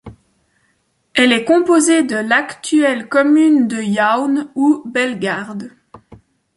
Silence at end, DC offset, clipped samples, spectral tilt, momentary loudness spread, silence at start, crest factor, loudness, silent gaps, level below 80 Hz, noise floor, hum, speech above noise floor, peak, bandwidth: 0.4 s; under 0.1%; under 0.1%; -3.5 dB/octave; 9 LU; 0.05 s; 14 dB; -15 LUFS; none; -58 dBFS; -63 dBFS; none; 49 dB; -2 dBFS; 11.5 kHz